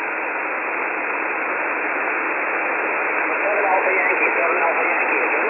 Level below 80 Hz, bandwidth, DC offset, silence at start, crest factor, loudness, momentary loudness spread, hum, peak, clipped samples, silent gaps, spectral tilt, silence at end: -74 dBFS; 3.2 kHz; under 0.1%; 0 s; 16 dB; -19 LUFS; 5 LU; none; -6 dBFS; under 0.1%; none; -7.5 dB/octave; 0 s